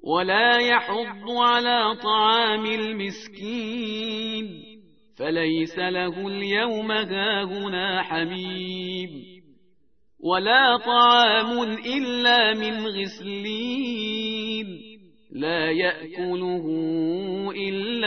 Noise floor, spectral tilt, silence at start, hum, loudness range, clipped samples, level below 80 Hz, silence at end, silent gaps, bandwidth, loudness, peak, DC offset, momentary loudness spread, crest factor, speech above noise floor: -68 dBFS; -5 dB/octave; 0.05 s; none; 8 LU; under 0.1%; -64 dBFS; 0 s; none; 6.6 kHz; -23 LUFS; -6 dBFS; 0.1%; 14 LU; 18 dB; 45 dB